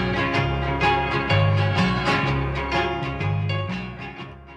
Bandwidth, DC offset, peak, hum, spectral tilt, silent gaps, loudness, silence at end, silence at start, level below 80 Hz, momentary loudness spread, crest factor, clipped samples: 9.2 kHz; under 0.1%; -8 dBFS; none; -6.5 dB/octave; none; -22 LUFS; 0 s; 0 s; -36 dBFS; 11 LU; 14 dB; under 0.1%